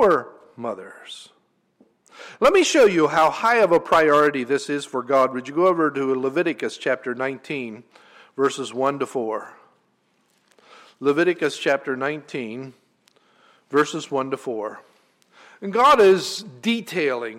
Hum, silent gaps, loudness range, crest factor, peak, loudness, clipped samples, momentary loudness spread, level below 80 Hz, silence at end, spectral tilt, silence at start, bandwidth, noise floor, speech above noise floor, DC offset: none; none; 10 LU; 16 dB; -6 dBFS; -21 LUFS; under 0.1%; 17 LU; -60 dBFS; 0 s; -4 dB/octave; 0 s; 16 kHz; -66 dBFS; 45 dB; under 0.1%